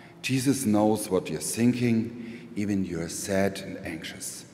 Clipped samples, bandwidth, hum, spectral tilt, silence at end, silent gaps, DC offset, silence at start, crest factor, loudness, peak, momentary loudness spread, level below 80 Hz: under 0.1%; 16 kHz; none; -5 dB/octave; 0 s; none; under 0.1%; 0 s; 16 dB; -27 LUFS; -10 dBFS; 13 LU; -60 dBFS